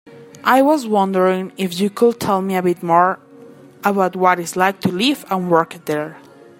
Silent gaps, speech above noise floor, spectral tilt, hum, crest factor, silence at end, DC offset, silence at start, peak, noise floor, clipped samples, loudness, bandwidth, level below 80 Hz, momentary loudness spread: none; 25 dB; -5.5 dB/octave; none; 18 dB; 0.4 s; under 0.1%; 0.05 s; 0 dBFS; -42 dBFS; under 0.1%; -17 LUFS; 16.5 kHz; -64 dBFS; 8 LU